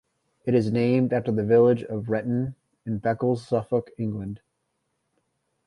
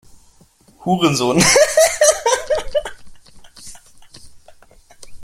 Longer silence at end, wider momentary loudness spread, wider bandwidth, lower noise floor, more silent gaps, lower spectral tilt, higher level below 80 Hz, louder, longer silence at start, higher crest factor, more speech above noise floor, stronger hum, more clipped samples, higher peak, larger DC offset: first, 1.3 s vs 0 s; second, 15 LU vs 20 LU; second, 10.5 kHz vs 16.5 kHz; first, -76 dBFS vs -51 dBFS; neither; first, -9 dB/octave vs -3 dB/octave; second, -58 dBFS vs -44 dBFS; second, -25 LUFS vs -15 LUFS; second, 0.45 s vs 0.8 s; about the same, 18 dB vs 18 dB; first, 53 dB vs 38 dB; neither; neither; second, -8 dBFS vs 0 dBFS; neither